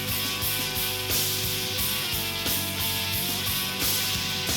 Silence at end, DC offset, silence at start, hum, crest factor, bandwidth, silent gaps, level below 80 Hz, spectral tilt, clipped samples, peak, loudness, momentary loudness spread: 0 s; under 0.1%; 0 s; none; 14 dB; 19 kHz; none; -46 dBFS; -1.5 dB/octave; under 0.1%; -12 dBFS; -25 LUFS; 2 LU